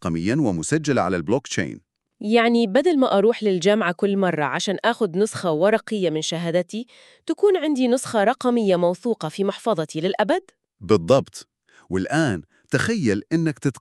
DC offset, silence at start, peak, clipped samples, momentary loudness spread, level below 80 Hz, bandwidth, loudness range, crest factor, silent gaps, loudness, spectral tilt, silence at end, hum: under 0.1%; 0 s; -4 dBFS; under 0.1%; 9 LU; -58 dBFS; 12.5 kHz; 3 LU; 18 dB; none; -21 LUFS; -5.5 dB/octave; 0 s; none